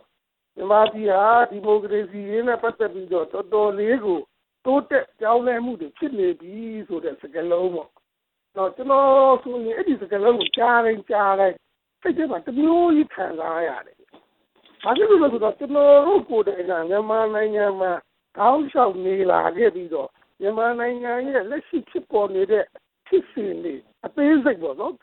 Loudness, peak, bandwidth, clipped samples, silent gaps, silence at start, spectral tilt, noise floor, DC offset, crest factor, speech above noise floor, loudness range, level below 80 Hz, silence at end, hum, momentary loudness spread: -21 LUFS; -4 dBFS; 4.2 kHz; under 0.1%; none; 0.55 s; -9 dB/octave; -79 dBFS; under 0.1%; 16 dB; 59 dB; 5 LU; -64 dBFS; 0.05 s; none; 13 LU